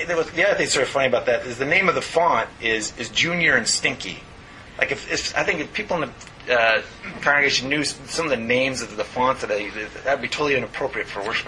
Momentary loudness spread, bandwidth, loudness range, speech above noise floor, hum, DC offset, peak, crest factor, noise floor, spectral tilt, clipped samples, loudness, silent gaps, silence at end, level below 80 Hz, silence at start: 9 LU; 11.5 kHz; 3 LU; 20 dB; none; under 0.1%; -2 dBFS; 20 dB; -42 dBFS; -2.5 dB/octave; under 0.1%; -21 LUFS; none; 0 s; -50 dBFS; 0 s